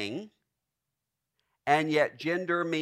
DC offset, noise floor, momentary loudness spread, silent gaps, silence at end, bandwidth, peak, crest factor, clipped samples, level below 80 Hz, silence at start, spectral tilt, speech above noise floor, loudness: under 0.1%; -86 dBFS; 12 LU; none; 0 s; 14.5 kHz; -10 dBFS; 22 dB; under 0.1%; -78 dBFS; 0 s; -5.5 dB/octave; 58 dB; -28 LUFS